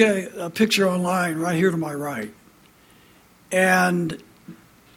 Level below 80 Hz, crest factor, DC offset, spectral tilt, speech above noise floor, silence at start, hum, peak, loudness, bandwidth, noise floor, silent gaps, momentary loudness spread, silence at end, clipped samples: -62 dBFS; 20 dB; under 0.1%; -5 dB/octave; 32 dB; 0 s; none; -4 dBFS; -22 LUFS; 17 kHz; -53 dBFS; none; 12 LU; 0.4 s; under 0.1%